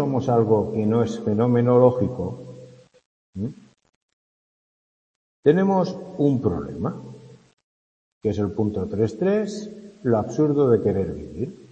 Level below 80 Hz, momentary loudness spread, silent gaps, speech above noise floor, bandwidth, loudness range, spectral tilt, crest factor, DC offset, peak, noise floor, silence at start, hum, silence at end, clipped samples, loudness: -54 dBFS; 14 LU; 3.06-3.33 s, 3.96-5.43 s, 7.53-7.57 s, 7.63-8.21 s; 25 dB; 8.6 kHz; 5 LU; -8.5 dB/octave; 20 dB; under 0.1%; -2 dBFS; -47 dBFS; 0 s; none; 0.15 s; under 0.1%; -22 LUFS